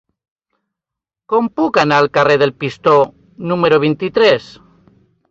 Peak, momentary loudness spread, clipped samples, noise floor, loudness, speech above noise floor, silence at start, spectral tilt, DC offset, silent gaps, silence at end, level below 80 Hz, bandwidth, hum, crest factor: 0 dBFS; 7 LU; under 0.1%; -85 dBFS; -14 LUFS; 71 dB; 1.3 s; -6 dB/octave; under 0.1%; none; 0.85 s; -56 dBFS; 7.6 kHz; none; 14 dB